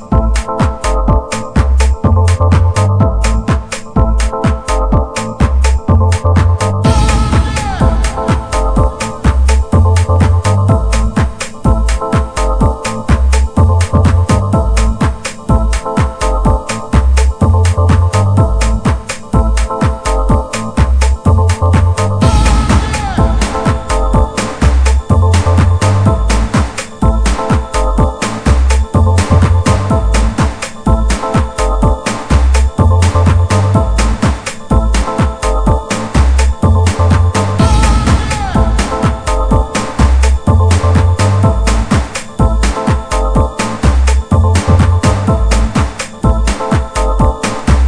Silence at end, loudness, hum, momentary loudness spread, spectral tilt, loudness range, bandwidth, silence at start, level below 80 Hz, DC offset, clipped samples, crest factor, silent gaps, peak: 0 s; -12 LUFS; none; 5 LU; -6 dB/octave; 1 LU; 10.5 kHz; 0 s; -14 dBFS; under 0.1%; 0.5%; 10 dB; none; 0 dBFS